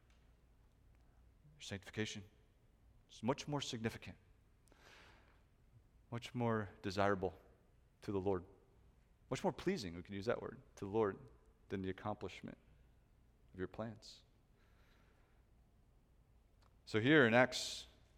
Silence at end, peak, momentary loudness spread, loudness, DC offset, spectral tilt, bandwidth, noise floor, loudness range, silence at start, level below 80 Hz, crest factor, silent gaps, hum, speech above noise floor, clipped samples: 0.3 s; -16 dBFS; 19 LU; -40 LUFS; under 0.1%; -5 dB/octave; 16 kHz; -70 dBFS; 15 LU; 1.45 s; -68 dBFS; 26 dB; none; none; 31 dB; under 0.1%